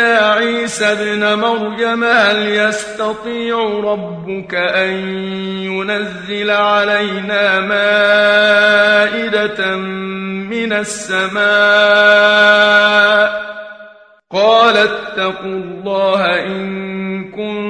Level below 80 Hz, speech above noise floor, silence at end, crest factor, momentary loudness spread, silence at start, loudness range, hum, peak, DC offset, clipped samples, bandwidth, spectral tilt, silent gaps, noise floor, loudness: -56 dBFS; 27 dB; 0 s; 14 dB; 13 LU; 0 s; 7 LU; none; 0 dBFS; under 0.1%; under 0.1%; 10.5 kHz; -3.5 dB/octave; none; -41 dBFS; -13 LUFS